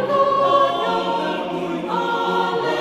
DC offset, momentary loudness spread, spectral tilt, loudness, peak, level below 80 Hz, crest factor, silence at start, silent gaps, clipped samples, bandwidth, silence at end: under 0.1%; 8 LU; -5.5 dB/octave; -20 LUFS; -4 dBFS; -60 dBFS; 16 dB; 0 s; none; under 0.1%; 13.5 kHz; 0 s